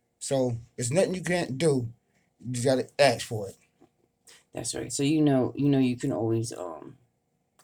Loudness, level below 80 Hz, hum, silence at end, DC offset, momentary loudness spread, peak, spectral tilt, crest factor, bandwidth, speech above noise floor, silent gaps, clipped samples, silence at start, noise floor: -27 LUFS; -62 dBFS; none; 0.7 s; under 0.1%; 15 LU; -8 dBFS; -5.5 dB/octave; 20 dB; 19 kHz; 48 dB; none; under 0.1%; 0.2 s; -74 dBFS